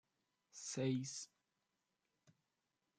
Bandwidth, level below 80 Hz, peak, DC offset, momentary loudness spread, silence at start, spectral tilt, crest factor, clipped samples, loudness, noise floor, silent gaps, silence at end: 9.6 kHz; -90 dBFS; -28 dBFS; under 0.1%; 17 LU; 0.55 s; -5 dB/octave; 20 dB; under 0.1%; -44 LUFS; -89 dBFS; none; 1.75 s